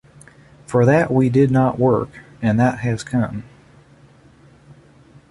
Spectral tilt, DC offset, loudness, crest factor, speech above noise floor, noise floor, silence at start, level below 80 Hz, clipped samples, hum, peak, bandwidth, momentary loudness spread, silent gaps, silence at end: -8 dB/octave; under 0.1%; -18 LUFS; 16 dB; 32 dB; -49 dBFS; 0.7 s; -48 dBFS; under 0.1%; none; -2 dBFS; 11.5 kHz; 9 LU; none; 1.9 s